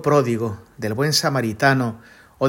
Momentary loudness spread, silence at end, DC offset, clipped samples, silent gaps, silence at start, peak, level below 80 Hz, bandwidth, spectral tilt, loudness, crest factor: 11 LU; 0 s; under 0.1%; under 0.1%; none; 0 s; -2 dBFS; -58 dBFS; 16.5 kHz; -4.5 dB/octave; -20 LUFS; 18 dB